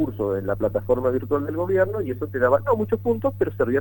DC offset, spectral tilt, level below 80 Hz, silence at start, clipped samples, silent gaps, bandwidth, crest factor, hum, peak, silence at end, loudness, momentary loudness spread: under 0.1%; -9.5 dB/octave; -48 dBFS; 0 s; under 0.1%; none; 19 kHz; 18 dB; 50 Hz at -35 dBFS; -4 dBFS; 0 s; -23 LUFS; 5 LU